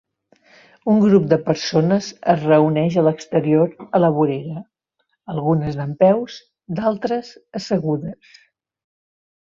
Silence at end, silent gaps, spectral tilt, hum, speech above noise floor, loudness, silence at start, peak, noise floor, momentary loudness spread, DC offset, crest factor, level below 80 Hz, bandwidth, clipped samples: 1.3 s; none; -7.5 dB/octave; none; 53 dB; -18 LUFS; 0.85 s; 0 dBFS; -71 dBFS; 15 LU; under 0.1%; 18 dB; -58 dBFS; 7.4 kHz; under 0.1%